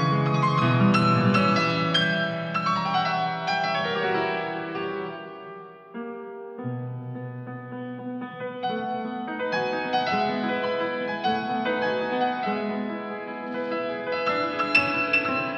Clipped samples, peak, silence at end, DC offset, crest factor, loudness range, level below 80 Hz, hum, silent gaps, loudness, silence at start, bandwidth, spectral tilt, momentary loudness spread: under 0.1%; -6 dBFS; 0 s; under 0.1%; 20 dB; 12 LU; -68 dBFS; none; none; -25 LUFS; 0 s; 9 kHz; -6.5 dB/octave; 15 LU